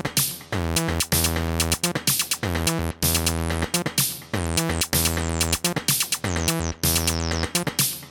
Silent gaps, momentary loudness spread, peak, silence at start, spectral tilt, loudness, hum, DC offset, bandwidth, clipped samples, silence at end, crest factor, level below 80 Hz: none; 4 LU; -6 dBFS; 0 s; -3 dB/octave; -22 LUFS; none; under 0.1%; 19 kHz; under 0.1%; 0 s; 18 dB; -36 dBFS